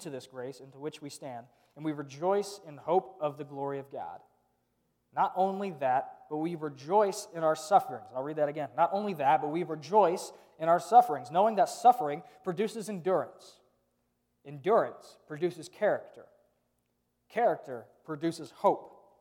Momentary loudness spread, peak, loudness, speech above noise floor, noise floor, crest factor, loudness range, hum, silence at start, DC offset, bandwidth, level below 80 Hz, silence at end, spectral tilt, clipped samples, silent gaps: 17 LU; -8 dBFS; -30 LUFS; 47 dB; -78 dBFS; 22 dB; 8 LU; 60 Hz at -75 dBFS; 0 s; under 0.1%; 17.5 kHz; -84 dBFS; 0.3 s; -5.5 dB/octave; under 0.1%; none